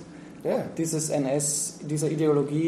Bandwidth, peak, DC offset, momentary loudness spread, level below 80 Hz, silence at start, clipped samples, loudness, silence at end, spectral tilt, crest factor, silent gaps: 14.5 kHz; -12 dBFS; under 0.1%; 6 LU; -66 dBFS; 0 s; under 0.1%; -26 LUFS; 0 s; -5 dB/octave; 14 dB; none